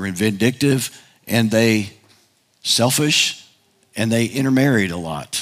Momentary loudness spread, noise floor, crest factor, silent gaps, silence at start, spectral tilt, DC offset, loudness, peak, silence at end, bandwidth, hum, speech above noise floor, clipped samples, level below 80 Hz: 12 LU; -58 dBFS; 16 dB; none; 0 s; -4 dB/octave; under 0.1%; -18 LUFS; -2 dBFS; 0 s; 16 kHz; none; 40 dB; under 0.1%; -60 dBFS